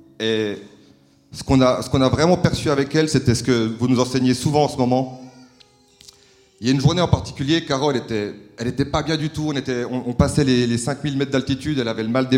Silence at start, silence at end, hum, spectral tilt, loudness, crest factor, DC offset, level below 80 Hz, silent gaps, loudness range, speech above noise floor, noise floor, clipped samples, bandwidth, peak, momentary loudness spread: 0.2 s; 0 s; none; -6 dB/octave; -20 LUFS; 20 dB; under 0.1%; -42 dBFS; none; 4 LU; 34 dB; -53 dBFS; under 0.1%; 15 kHz; 0 dBFS; 9 LU